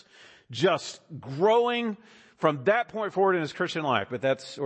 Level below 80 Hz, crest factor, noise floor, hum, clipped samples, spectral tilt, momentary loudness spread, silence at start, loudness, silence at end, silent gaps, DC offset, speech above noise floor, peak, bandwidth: -72 dBFS; 20 dB; -54 dBFS; none; under 0.1%; -5 dB/octave; 15 LU; 0.5 s; -26 LUFS; 0 s; none; under 0.1%; 28 dB; -8 dBFS; 8.6 kHz